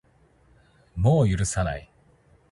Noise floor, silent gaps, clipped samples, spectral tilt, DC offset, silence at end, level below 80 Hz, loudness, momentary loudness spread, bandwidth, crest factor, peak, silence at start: -60 dBFS; none; under 0.1%; -6.5 dB/octave; under 0.1%; 0.7 s; -40 dBFS; -24 LUFS; 16 LU; 11.5 kHz; 18 dB; -8 dBFS; 0.95 s